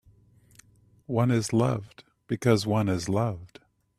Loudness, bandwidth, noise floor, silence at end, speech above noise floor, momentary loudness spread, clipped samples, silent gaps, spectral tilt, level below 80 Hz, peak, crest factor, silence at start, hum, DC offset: -26 LUFS; 14 kHz; -59 dBFS; 0.55 s; 33 dB; 9 LU; under 0.1%; none; -6.5 dB/octave; -58 dBFS; -8 dBFS; 20 dB; 1.1 s; none; under 0.1%